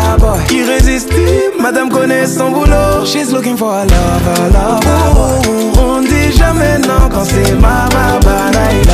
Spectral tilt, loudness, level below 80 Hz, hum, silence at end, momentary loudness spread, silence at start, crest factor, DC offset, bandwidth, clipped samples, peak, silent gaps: -5.5 dB/octave; -10 LUFS; -14 dBFS; none; 0 s; 3 LU; 0 s; 8 dB; under 0.1%; 15.5 kHz; under 0.1%; 0 dBFS; none